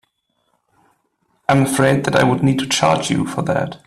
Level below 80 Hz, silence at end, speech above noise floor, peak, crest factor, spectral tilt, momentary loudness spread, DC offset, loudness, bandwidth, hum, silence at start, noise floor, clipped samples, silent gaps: -50 dBFS; 0.1 s; 51 dB; 0 dBFS; 18 dB; -5 dB/octave; 5 LU; under 0.1%; -17 LUFS; 14.5 kHz; none; 1.5 s; -67 dBFS; under 0.1%; none